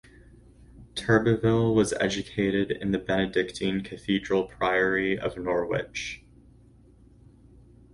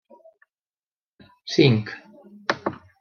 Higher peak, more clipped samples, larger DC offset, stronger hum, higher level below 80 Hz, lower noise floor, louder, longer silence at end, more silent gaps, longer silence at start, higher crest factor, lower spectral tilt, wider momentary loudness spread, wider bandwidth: about the same, -6 dBFS vs -4 dBFS; neither; neither; neither; first, -52 dBFS vs -68 dBFS; second, -55 dBFS vs under -90 dBFS; second, -26 LUFS vs -23 LUFS; first, 1.75 s vs 0.25 s; neither; second, 0.75 s vs 1.45 s; about the same, 20 dB vs 22 dB; about the same, -5.5 dB/octave vs -6.5 dB/octave; second, 10 LU vs 21 LU; first, 11.5 kHz vs 6.8 kHz